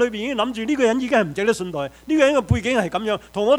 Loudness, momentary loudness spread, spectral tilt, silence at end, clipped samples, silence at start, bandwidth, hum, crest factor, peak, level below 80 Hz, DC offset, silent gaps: -21 LUFS; 7 LU; -5.5 dB/octave; 0 s; under 0.1%; 0 s; 16 kHz; none; 16 dB; -4 dBFS; -42 dBFS; under 0.1%; none